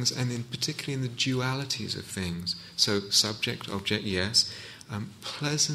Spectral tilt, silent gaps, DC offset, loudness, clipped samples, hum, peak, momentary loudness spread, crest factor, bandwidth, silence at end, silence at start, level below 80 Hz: -3 dB/octave; none; under 0.1%; -28 LUFS; under 0.1%; none; -8 dBFS; 12 LU; 22 dB; 15.5 kHz; 0 s; 0 s; -60 dBFS